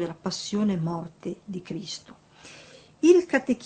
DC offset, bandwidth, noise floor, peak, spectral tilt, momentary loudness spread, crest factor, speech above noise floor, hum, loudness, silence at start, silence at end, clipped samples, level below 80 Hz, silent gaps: under 0.1%; 8.8 kHz; -50 dBFS; -6 dBFS; -5.5 dB/octave; 18 LU; 20 dB; 25 dB; none; -25 LUFS; 0 s; 0 s; under 0.1%; -64 dBFS; none